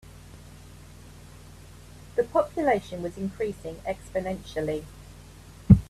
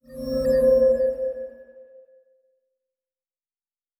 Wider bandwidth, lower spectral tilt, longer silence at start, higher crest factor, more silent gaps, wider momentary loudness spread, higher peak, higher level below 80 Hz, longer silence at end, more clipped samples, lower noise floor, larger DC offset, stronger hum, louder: second, 13.5 kHz vs 16.5 kHz; about the same, -8 dB/octave vs -7 dB/octave; about the same, 0.15 s vs 0.1 s; first, 26 dB vs 16 dB; neither; first, 23 LU vs 16 LU; first, -2 dBFS vs -10 dBFS; first, -42 dBFS vs -48 dBFS; second, 0.05 s vs 2.2 s; neither; second, -47 dBFS vs under -90 dBFS; neither; neither; second, -28 LUFS vs -21 LUFS